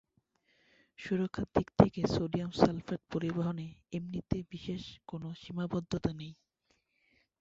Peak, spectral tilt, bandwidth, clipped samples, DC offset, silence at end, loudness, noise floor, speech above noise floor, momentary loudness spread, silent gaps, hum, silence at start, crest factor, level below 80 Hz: -6 dBFS; -7 dB/octave; 7.8 kHz; under 0.1%; under 0.1%; 1.1 s; -34 LUFS; -77 dBFS; 43 dB; 15 LU; none; none; 1 s; 28 dB; -54 dBFS